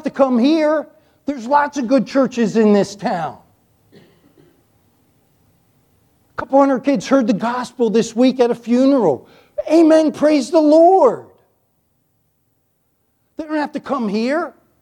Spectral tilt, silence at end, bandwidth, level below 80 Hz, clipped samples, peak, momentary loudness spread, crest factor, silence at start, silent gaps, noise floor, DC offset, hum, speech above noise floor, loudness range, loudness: -6 dB/octave; 0.3 s; 11 kHz; -62 dBFS; under 0.1%; 0 dBFS; 16 LU; 16 dB; 0.05 s; none; -65 dBFS; under 0.1%; none; 50 dB; 11 LU; -16 LUFS